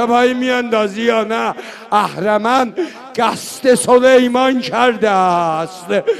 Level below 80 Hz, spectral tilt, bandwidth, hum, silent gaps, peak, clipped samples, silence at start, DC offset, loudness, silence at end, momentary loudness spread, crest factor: -56 dBFS; -4 dB/octave; 13.5 kHz; none; none; 0 dBFS; under 0.1%; 0 s; under 0.1%; -14 LUFS; 0 s; 9 LU; 14 dB